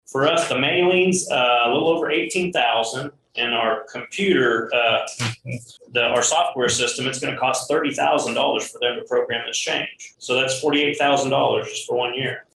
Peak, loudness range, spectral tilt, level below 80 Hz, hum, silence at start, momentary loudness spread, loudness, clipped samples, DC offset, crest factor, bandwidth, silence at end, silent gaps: -4 dBFS; 2 LU; -3 dB/octave; -62 dBFS; none; 0.1 s; 9 LU; -20 LUFS; under 0.1%; under 0.1%; 16 dB; 12.5 kHz; 0.15 s; none